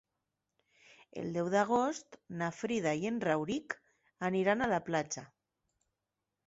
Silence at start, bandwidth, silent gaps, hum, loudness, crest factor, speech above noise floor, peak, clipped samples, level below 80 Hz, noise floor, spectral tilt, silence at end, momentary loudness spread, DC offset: 1.15 s; 7.6 kHz; none; none; -34 LUFS; 18 dB; 55 dB; -16 dBFS; under 0.1%; -70 dBFS; -88 dBFS; -4.5 dB/octave; 1.2 s; 13 LU; under 0.1%